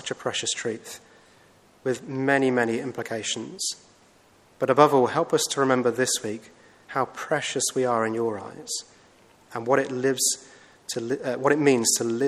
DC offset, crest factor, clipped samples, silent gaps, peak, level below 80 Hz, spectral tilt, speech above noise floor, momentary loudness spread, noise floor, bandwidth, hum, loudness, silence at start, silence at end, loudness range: under 0.1%; 24 dB; under 0.1%; none; -2 dBFS; -72 dBFS; -3 dB/octave; 33 dB; 14 LU; -57 dBFS; 14.5 kHz; none; -24 LUFS; 0 s; 0 s; 4 LU